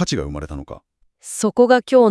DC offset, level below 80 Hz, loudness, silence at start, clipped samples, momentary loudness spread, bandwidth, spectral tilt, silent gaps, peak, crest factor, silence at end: under 0.1%; -40 dBFS; -17 LUFS; 0 s; under 0.1%; 20 LU; 12 kHz; -5 dB/octave; none; -2 dBFS; 16 dB; 0 s